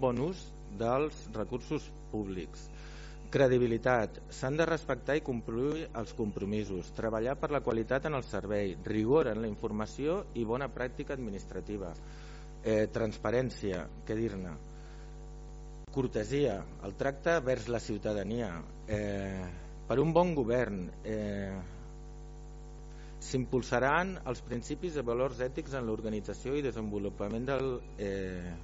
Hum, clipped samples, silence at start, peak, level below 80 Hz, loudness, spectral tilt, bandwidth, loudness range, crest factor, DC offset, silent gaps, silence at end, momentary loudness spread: none; under 0.1%; 0 s; -12 dBFS; -48 dBFS; -34 LUFS; -6 dB/octave; 7.6 kHz; 5 LU; 22 dB; under 0.1%; none; 0 s; 19 LU